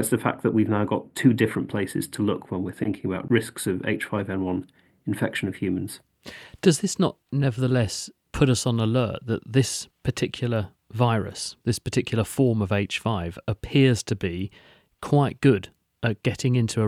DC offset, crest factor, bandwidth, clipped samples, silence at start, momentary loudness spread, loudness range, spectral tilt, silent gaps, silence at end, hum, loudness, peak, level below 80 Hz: under 0.1%; 20 dB; 15.5 kHz; under 0.1%; 0 s; 10 LU; 3 LU; -6 dB/octave; none; 0 s; none; -25 LUFS; -4 dBFS; -52 dBFS